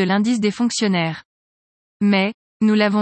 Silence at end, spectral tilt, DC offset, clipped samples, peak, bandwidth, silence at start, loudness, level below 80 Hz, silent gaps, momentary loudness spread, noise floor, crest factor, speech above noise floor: 0 s; -5 dB/octave; under 0.1%; under 0.1%; -6 dBFS; 8.8 kHz; 0 s; -19 LUFS; -66 dBFS; 1.25-2.00 s, 2.34-2.60 s; 7 LU; under -90 dBFS; 14 dB; over 72 dB